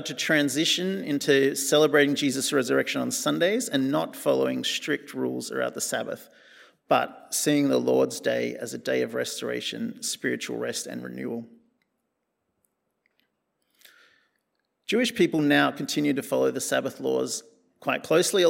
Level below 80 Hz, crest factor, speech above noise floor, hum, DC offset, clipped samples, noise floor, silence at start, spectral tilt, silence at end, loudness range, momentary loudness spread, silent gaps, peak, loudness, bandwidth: -78 dBFS; 20 dB; 53 dB; none; under 0.1%; under 0.1%; -79 dBFS; 0 s; -3.5 dB/octave; 0 s; 11 LU; 10 LU; none; -6 dBFS; -25 LUFS; 16.5 kHz